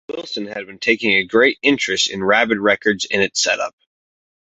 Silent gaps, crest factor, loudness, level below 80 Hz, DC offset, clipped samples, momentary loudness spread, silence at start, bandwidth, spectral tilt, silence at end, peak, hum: none; 18 dB; -17 LUFS; -58 dBFS; under 0.1%; under 0.1%; 12 LU; 0.1 s; 8.2 kHz; -2.5 dB/octave; 0.8 s; -2 dBFS; none